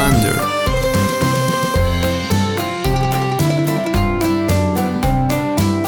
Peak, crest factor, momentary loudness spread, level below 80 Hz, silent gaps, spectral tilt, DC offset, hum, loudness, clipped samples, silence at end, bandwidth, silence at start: -2 dBFS; 14 dB; 2 LU; -28 dBFS; none; -5.5 dB/octave; under 0.1%; none; -17 LUFS; under 0.1%; 0 s; over 20 kHz; 0 s